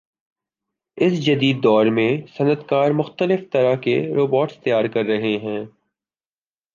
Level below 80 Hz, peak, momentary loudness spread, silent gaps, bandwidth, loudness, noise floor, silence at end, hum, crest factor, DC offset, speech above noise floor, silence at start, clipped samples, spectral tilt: -66 dBFS; -4 dBFS; 6 LU; none; 7.2 kHz; -19 LUFS; under -90 dBFS; 1.05 s; none; 16 dB; under 0.1%; over 71 dB; 0.95 s; under 0.1%; -7.5 dB/octave